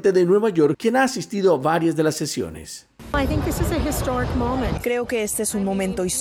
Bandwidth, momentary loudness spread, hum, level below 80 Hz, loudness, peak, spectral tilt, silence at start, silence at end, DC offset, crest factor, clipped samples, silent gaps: 18.5 kHz; 9 LU; none; -34 dBFS; -21 LUFS; -8 dBFS; -5 dB/octave; 0 s; 0 s; under 0.1%; 14 dB; under 0.1%; none